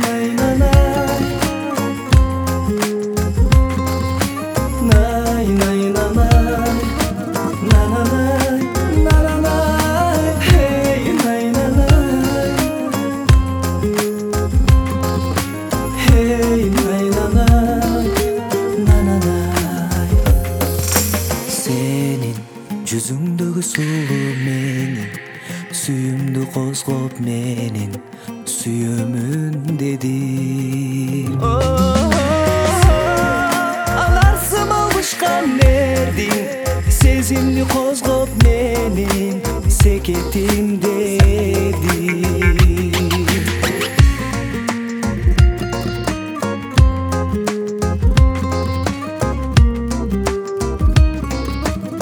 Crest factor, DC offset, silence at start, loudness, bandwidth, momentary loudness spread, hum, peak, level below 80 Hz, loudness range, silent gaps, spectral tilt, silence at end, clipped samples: 16 dB; under 0.1%; 0 s; -16 LUFS; over 20 kHz; 8 LU; none; 0 dBFS; -20 dBFS; 6 LU; none; -5.5 dB/octave; 0 s; under 0.1%